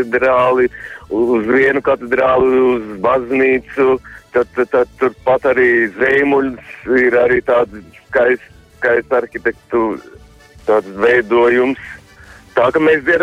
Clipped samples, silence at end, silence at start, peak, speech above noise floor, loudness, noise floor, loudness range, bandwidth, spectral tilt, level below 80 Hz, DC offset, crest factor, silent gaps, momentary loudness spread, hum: under 0.1%; 0 s; 0 s; -2 dBFS; 27 dB; -14 LUFS; -41 dBFS; 3 LU; 8.6 kHz; -6.5 dB/octave; -46 dBFS; under 0.1%; 12 dB; none; 9 LU; none